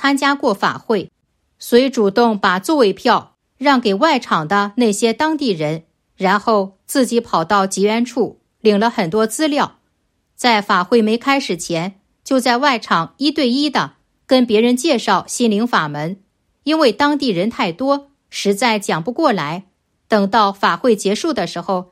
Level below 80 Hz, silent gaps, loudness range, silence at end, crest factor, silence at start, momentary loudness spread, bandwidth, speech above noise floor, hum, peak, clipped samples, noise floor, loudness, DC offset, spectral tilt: -60 dBFS; none; 2 LU; 0.1 s; 16 dB; 0 s; 8 LU; 15.5 kHz; 50 dB; none; 0 dBFS; under 0.1%; -66 dBFS; -16 LUFS; under 0.1%; -4.5 dB/octave